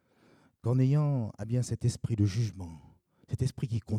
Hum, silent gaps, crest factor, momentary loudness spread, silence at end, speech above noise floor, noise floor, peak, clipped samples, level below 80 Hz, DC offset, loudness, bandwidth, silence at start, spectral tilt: none; none; 16 dB; 12 LU; 0 s; 34 dB; -64 dBFS; -16 dBFS; under 0.1%; -60 dBFS; under 0.1%; -31 LUFS; 11 kHz; 0.65 s; -7.5 dB/octave